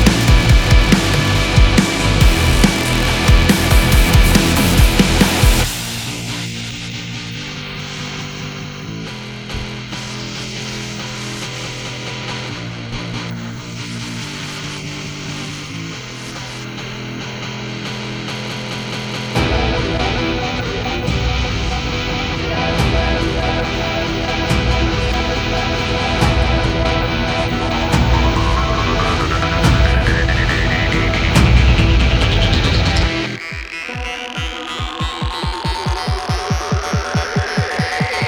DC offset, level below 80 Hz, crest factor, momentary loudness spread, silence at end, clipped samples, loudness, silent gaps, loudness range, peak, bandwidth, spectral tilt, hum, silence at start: under 0.1%; -20 dBFS; 16 dB; 13 LU; 0 s; under 0.1%; -17 LUFS; none; 12 LU; 0 dBFS; over 20 kHz; -4.5 dB/octave; none; 0 s